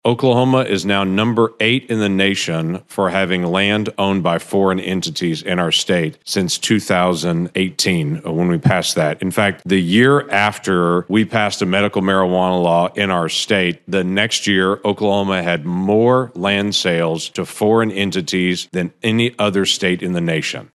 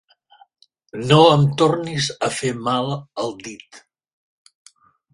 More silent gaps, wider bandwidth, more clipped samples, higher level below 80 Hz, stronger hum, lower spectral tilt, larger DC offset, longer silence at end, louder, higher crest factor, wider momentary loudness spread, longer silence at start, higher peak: neither; about the same, 12.5 kHz vs 11.5 kHz; neither; about the same, -60 dBFS vs -58 dBFS; neither; about the same, -5 dB/octave vs -5.5 dB/octave; neither; second, 0.1 s vs 1.35 s; about the same, -16 LUFS vs -18 LUFS; about the same, 16 dB vs 20 dB; second, 5 LU vs 22 LU; second, 0.05 s vs 0.95 s; about the same, 0 dBFS vs 0 dBFS